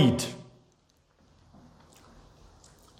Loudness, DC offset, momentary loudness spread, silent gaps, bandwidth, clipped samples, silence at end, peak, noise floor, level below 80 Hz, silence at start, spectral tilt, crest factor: -30 LUFS; under 0.1%; 26 LU; none; 16 kHz; under 0.1%; 2.55 s; -8 dBFS; -66 dBFS; -62 dBFS; 0 s; -5.5 dB/octave; 24 dB